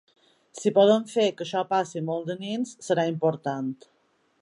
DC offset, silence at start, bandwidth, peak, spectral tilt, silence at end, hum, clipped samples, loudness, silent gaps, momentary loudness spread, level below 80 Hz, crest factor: under 0.1%; 0.55 s; 11.5 kHz; -8 dBFS; -5.5 dB/octave; 0.65 s; none; under 0.1%; -26 LUFS; none; 12 LU; -78 dBFS; 18 dB